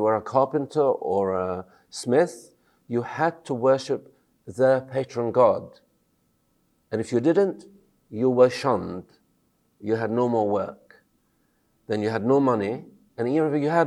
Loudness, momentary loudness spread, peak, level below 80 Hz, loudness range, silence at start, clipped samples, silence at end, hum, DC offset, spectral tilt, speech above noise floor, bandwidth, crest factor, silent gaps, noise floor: -24 LUFS; 15 LU; -4 dBFS; -68 dBFS; 2 LU; 0 s; under 0.1%; 0 s; none; under 0.1%; -6.5 dB/octave; 45 dB; 12 kHz; 20 dB; none; -68 dBFS